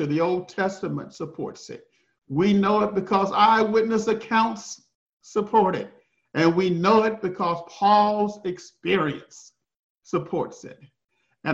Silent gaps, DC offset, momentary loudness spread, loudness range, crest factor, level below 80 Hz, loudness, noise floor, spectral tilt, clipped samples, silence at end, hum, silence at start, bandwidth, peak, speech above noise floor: 4.95-5.17 s, 9.79-9.95 s; under 0.1%; 17 LU; 3 LU; 18 dB; -62 dBFS; -23 LUFS; -73 dBFS; -6 dB/octave; under 0.1%; 0 s; none; 0 s; 7.8 kHz; -6 dBFS; 50 dB